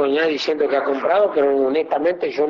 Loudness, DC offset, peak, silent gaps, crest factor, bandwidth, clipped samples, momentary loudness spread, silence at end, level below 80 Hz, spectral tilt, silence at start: -19 LUFS; under 0.1%; -8 dBFS; none; 12 dB; 7.4 kHz; under 0.1%; 3 LU; 0 s; -64 dBFS; -4.5 dB/octave; 0 s